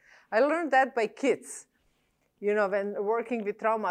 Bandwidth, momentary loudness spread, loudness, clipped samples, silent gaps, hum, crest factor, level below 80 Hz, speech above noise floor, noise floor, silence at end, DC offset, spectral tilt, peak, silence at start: 13 kHz; 9 LU; -28 LUFS; under 0.1%; none; none; 16 dB; -80 dBFS; 45 dB; -72 dBFS; 0 s; under 0.1%; -4.5 dB/octave; -12 dBFS; 0.3 s